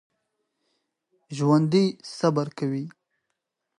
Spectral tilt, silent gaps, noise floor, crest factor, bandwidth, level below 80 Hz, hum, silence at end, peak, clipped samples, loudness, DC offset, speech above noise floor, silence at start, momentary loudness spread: -7 dB/octave; none; -81 dBFS; 20 dB; 11 kHz; -74 dBFS; none; 0.9 s; -8 dBFS; under 0.1%; -24 LUFS; under 0.1%; 57 dB; 1.3 s; 14 LU